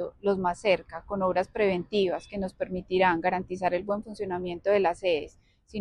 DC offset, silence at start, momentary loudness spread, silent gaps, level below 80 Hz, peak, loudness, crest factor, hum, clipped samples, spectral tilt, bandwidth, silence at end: under 0.1%; 0 s; 9 LU; none; -54 dBFS; -10 dBFS; -28 LUFS; 18 dB; none; under 0.1%; -6 dB/octave; 10.5 kHz; 0 s